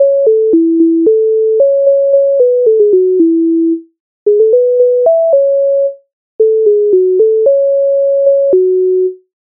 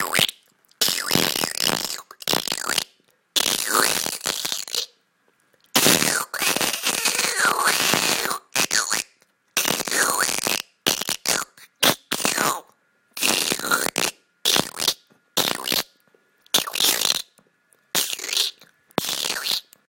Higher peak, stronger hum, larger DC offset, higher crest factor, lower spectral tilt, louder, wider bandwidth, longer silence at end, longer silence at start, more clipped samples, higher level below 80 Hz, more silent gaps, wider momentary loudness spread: about the same, 0 dBFS vs 0 dBFS; neither; neither; second, 8 dB vs 24 dB; first, -12.5 dB/octave vs -0.5 dB/octave; first, -10 LUFS vs -21 LUFS; second, 1.1 kHz vs 17 kHz; about the same, 0.4 s vs 0.4 s; about the same, 0 s vs 0 s; neither; about the same, -66 dBFS vs -62 dBFS; first, 4.00-4.26 s, 6.13-6.39 s vs none; second, 4 LU vs 8 LU